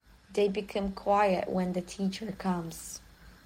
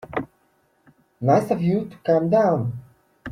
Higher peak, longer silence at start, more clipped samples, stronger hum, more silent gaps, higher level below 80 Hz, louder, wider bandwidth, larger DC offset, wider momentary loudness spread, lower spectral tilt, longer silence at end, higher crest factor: second, -14 dBFS vs -6 dBFS; first, 0.3 s vs 0.05 s; neither; neither; neither; about the same, -56 dBFS vs -60 dBFS; second, -31 LUFS vs -21 LUFS; first, 16.5 kHz vs 14.5 kHz; neither; second, 14 LU vs 19 LU; second, -5.5 dB/octave vs -8.5 dB/octave; about the same, 0.1 s vs 0 s; about the same, 18 dB vs 18 dB